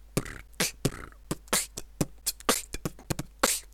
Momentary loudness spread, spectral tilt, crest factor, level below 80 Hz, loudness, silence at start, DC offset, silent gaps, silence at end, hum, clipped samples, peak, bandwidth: 12 LU; -2.5 dB/octave; 28 dB; -46 dBFS; -31 LUFS; 0 s; under 0.1%; none; 0 s; none; under 0.1%; -4 dBFS; 18.5 kHz